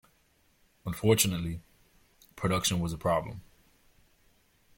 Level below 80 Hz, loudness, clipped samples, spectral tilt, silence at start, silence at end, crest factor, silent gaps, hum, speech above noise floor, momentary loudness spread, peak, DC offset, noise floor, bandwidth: -54 dBFS; -29 LUFS; under 0.1%; -4 dB/octave; 0.85 s; 1.35 s; 22 dB; none; none; 39 dB; 19 LU; -10 dBFS; under 0.1%; -68 dBFS; 16.5 kHz